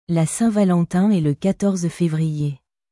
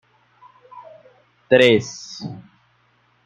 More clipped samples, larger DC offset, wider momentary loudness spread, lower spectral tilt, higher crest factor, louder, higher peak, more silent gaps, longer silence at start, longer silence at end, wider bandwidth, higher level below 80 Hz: neither; neither; second, 7 LU vs 21 LU; first, -7 dB/octave vs -4.5 dB/octave; second, 12 dB vs 20 dB; second, -20 LUFS vs -16 LUFS; second, -6 dBFS vs -2 dBFS; neither; second, 0.1 s vs 0.75 s; second, 0.35 s vs 0.85 s; first, 12 kHz vs 9.4 kHz; first, -54 dBFS vs -64 dBFS